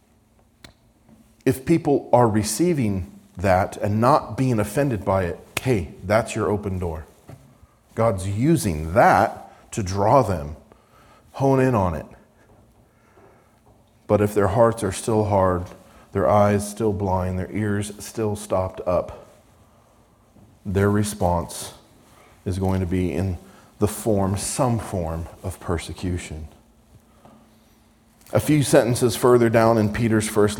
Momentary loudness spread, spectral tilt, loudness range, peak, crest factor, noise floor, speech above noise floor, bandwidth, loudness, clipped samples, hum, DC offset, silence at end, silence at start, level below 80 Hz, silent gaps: 13 LU; -6 dB/octave; 6 LU; -2 dBFS; 20 dB; -58 dBFS; 37 dB; 19 kHz; -21 LUFS; under 0.1%; none; under 0.1%; 0 s; 1.45 s; -48 dBFS; none